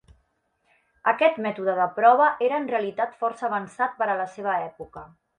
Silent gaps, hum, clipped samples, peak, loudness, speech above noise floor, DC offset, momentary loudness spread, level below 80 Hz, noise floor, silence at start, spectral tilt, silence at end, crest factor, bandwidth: none; none; under 0.1%; -4 dBFS; -24 LUFS; 47 dB; under 0.1%; 10 LU; -66 dBFS; -71 dBFS; 1.05 s; -5.5 dB/octave; 0.3 s; 20 dB; 9.6 kHz